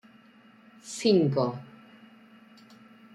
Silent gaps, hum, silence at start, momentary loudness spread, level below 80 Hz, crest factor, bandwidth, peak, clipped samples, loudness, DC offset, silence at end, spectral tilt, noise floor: none; none; 0.85 s; 25 LU; -74 dBFS; 20 dB; 12 kHz; -12 dBFS; under 0.1%; -26 LUFS; under 0.1%; 1.5 s; -6 dB/octave; -56 dBFS